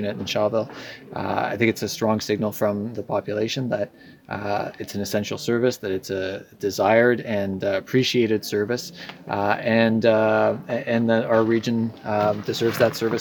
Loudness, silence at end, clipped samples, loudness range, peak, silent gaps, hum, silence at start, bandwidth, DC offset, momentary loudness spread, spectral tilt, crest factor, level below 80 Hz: -23 LUFS; 0 s; under 0.1%; 5 LU; -4 dBFS; none; none; 0 s; 19 kHz; under 0.1%; 11 LU; -5.5 dB/octave; 20 dB; -62 dBFS